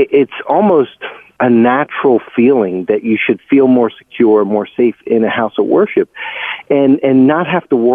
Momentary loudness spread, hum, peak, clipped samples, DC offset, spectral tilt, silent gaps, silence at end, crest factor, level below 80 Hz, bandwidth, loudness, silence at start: 7 LU; none; 0 dBFS; under 0.1%; under 0.1%; -9.5 dB/octave; none; 0 s; 12 dB; -58 dBFS; 3.7 kHz; -12 LUFS; 0 s